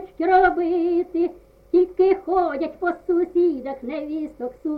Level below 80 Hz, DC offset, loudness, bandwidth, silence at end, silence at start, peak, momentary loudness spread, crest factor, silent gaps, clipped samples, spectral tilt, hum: -50 dBFS; under 0.1%; -22 LUFS; 4.9 kHz; 0 s; 0 s; -6 dBFS; 12 LU; 16 dB; none; under 0.1%; -7.5 dB/octave; none